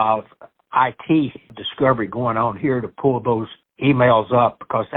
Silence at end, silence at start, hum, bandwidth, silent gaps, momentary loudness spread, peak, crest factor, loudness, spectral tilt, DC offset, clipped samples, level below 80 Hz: 0 s; 0 s; none; 4.1 kHz; none; 9 LU; -4 dBFS; 16 dB; -19 LUFS; -11 dB/octave; under 0.1%; under 0.1%; -54 dBFS